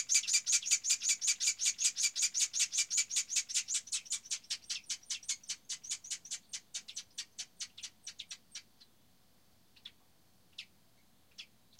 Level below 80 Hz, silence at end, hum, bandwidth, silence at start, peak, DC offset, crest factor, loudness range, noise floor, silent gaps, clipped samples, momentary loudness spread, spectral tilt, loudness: -82 dBFS; 0.35 s; none; 16.5 kHz; 0 s; -14 dBFS; under 0.1%; 24 dB; 20 LU; -69 dBFS; none; under 0.1%; 22 LU; 4.5 dB/octave; -33 LUFS